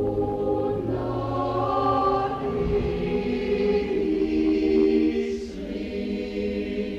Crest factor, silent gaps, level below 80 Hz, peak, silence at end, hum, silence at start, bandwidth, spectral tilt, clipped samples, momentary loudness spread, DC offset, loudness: 14 dB; none; -40 dBFS; -10 dBFS; 0 s; none; 0 s; 7.6 kHz; -8 dB/octave; under 0.1%; 8 LU; under 0.1%; -25 LUFS